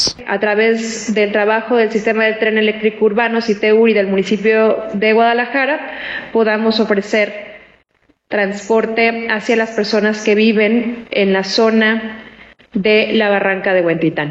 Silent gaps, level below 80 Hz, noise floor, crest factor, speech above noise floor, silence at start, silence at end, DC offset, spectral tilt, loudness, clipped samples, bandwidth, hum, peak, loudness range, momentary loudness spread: none; -56 dBFS; -58 dBFS; 12 dB; 44 dB; 0 s; 0 s; under 0.1%; -4.5 dB/octave; -14 LUFS; under 0.1%; 8.8 kHz; none; -2 dBFS; 3 LU; 7 LU